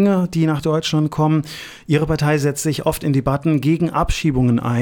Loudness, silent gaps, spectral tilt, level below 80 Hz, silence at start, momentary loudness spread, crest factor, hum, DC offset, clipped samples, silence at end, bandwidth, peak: -18 LUFS; none; -6.5 dB/octave; -34 dBFS; 0 s; 3 LU; 14 dB; none; under 0.1%; under 0.1%; 0 s; 18 kHz; -4 dBFS